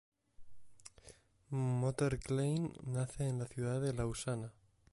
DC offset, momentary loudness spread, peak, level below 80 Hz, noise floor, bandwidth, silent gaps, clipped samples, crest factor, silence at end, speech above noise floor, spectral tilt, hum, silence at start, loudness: under 0.1%; 18 LU; -24 dBFS; -58 dBFS; -62 dBFS; 11.5 kHz; none; under 0.1%; 14 dB; 0.4 s; 26 dB; -6.5 dB/octave; none; 0.4 s; -38 LUFS